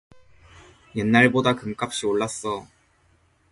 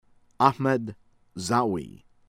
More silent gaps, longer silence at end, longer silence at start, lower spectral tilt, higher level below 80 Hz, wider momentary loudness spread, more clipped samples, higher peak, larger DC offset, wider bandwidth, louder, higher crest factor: neither; first, 0.85 s vs 0.4 s; first, 0.95 s vs 0.4 s; about the same, -5 dB/octave vs -5.5 dB/octave; about the same, -56 dBFS vs -60 dBFS; second, 14 LU vs 19 LU; neither; about the same, -2 dBFS vs -4 dBFS; neither; second, 11.5 kHz vs 16 kHz; first, -22 LUFS vs -25 LUFS; about the same, 22 dB vs 22 dB